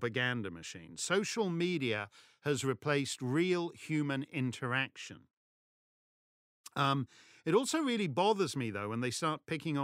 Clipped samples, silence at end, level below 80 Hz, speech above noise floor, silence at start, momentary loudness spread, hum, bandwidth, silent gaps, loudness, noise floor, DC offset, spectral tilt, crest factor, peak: under 0.1%; 0 s; -78 dBFS; over 56 dB; 0 s; 11 LU; none; 16 kHz; 5.33-6.64 s; -34 LUFS; under -90 dBFS; under 0.1%; -4.5 dB/octave; 20 dB; -16 dBFS